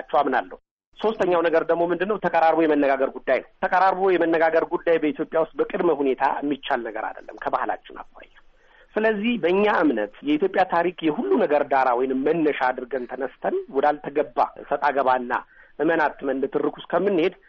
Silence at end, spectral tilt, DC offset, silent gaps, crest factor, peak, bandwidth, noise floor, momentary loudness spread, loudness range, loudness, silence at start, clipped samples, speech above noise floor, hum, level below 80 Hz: 0.15 s; -3.5 dB/octave; under 0.1%; 0.71-0.77 s, 0.86-0.92 s; 14 dB; -8 dBFS; 6.6 kHz; -53 dBFS; 9 LU; 5 LU; -22 LUFS; 0 s; under 0.1%; 31 dB; none; -56 dBFS